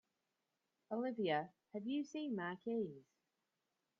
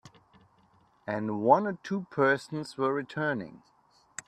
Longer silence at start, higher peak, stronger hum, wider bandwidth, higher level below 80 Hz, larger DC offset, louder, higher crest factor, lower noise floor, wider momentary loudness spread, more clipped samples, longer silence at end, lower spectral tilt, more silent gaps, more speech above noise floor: first, 0.9 s vs 0.05 s; second, -26 dBFS vs -6 dBFS; neither; second, 7.2 kHz vs 12 kHz; second, under -90 dBFS vs -74 dBFS; neither; second, -43 LUFS vs -29 LUFS; about the same, 20 dB vs 24 dB; first, -89 dBFS vs -64 dBFS; second, 9 LU vs 15 LU; neither; first, 1 s vs 0.7 s; second, -4.5 dB/octave vs -6 dB/octave; neither; first, 46 dB vs 36 dB